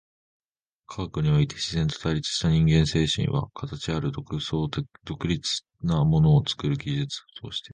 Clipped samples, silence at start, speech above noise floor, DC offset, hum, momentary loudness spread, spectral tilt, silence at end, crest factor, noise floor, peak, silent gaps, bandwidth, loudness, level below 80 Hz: under 0.1%; 0.9 s; 33 dB; under 0.1%; none; 13 LU; -6 dB/octave; 0.05 s; 18 dB; -58 dBFS; -8 dBFS; none; 9.6 kHz; -25 LUFS; -42 dBFS